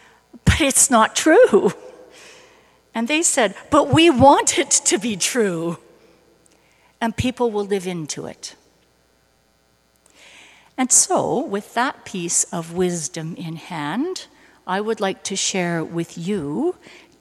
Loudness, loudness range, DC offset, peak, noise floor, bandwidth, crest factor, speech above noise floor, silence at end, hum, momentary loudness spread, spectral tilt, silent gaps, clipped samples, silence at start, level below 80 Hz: -18 LUFS; 10 LU; under 0.1%; 0 dBFS; -61 dBFS; 15 kHz; 20 dB; 42 dB; 0.5 s; none; 17 LU; -3.5 dB/octave; none; under 0.1%; 0.35 s; -42 dBFS